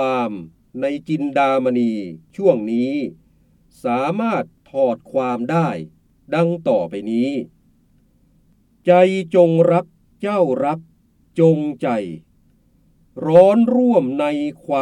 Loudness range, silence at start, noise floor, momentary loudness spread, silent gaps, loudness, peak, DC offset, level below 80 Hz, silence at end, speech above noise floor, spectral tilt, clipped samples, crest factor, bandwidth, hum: 5 LU; 0 s; -57 dBFS; 15 LU; none; -18 LUFS; 0 dBFS; under 0.1%; -60 dBFS; 0 s; 40 dB; -8 dB/octave; under 0.1%; 18 dB; 10 kHz; none